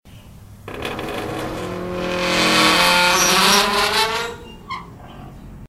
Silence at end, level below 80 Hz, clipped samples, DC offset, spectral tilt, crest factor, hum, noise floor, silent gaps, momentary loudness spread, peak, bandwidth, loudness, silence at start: 0 s; -42 dBFS; under 0.1%; under 0.1%; -2 dB/octave; 20 dB; none; -41 dBFS; none; 19 LU; 0 dBFS; 16 kHz; -16 LUFS; 0.05 s